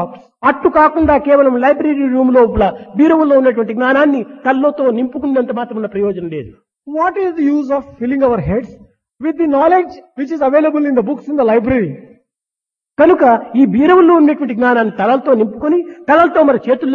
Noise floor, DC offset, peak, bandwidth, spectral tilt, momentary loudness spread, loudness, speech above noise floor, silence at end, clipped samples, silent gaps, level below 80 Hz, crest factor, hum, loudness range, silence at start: -86 dBFS; under 0.1%; 0 dBFS; 6 kHz; -8.5 dB/octave; 10 LU; -13 LUFS; 74 dB; 0 s; under 0.1%; none; -40 dBFS; 12 dB; none; 6 LU; 0 s